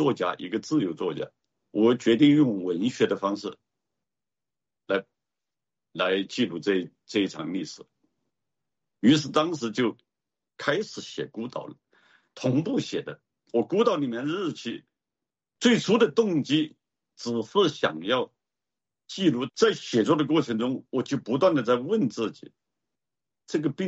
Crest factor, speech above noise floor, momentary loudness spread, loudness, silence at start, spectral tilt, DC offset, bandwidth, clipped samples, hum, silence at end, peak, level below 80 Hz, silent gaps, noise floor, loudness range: 18 dB; over 65 dB; 13 LU; -26 LUFS; 0 s; -5.5 dB/octave; under 0.1%; 8 kHz; under 0.1%; none; 0 s; -8 dBFS; -72 dBFS; none; under -90 dBFS; 6 LU